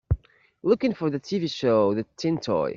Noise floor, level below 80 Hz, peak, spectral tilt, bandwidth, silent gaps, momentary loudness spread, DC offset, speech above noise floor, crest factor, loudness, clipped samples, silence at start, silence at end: -45 dBFS; -42 dBFS; -8 dBFS; -7 dB/octave; 7.6 kHz; none; 8 LU; under 0.1%; 21 dB; 16 dB; -25 LUFS; under 0.1%; 0.1 s; 0 s